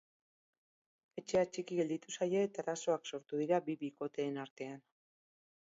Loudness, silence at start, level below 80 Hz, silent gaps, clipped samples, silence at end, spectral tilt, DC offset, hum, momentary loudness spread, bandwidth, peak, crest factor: -38 LUFS; 1.15 s; -78 dBFS; 4.50-4.56 s; under 0.1%; 0.9 s; -5 dB/octave; under 0.1%; none; 13 LU; 7.6 kHz; -20 dBFS; 20 dB